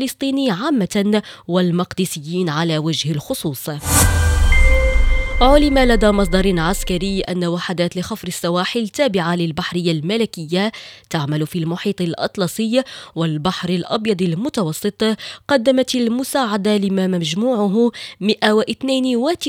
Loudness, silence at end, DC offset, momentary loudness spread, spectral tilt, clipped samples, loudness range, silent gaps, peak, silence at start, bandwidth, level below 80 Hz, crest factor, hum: -18 LUFS; 0 s; under 0.1%; 7 LU; -5 dB/octave; under 0.1%; 5 LU; none; 0 dBFS; 0 s; 16.5 kHz; -24 dBFS; 16 dB; none